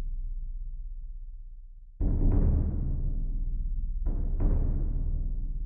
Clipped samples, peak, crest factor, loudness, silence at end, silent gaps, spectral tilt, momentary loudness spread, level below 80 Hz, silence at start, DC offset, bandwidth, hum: under 0.1%; -14 dBFS; 14 dB; -33 LUFS; 0 s; none; -14 dB/octave; 19 LU; -28 dBFS; 0 s; under 0.1%; 1.6 kHz; none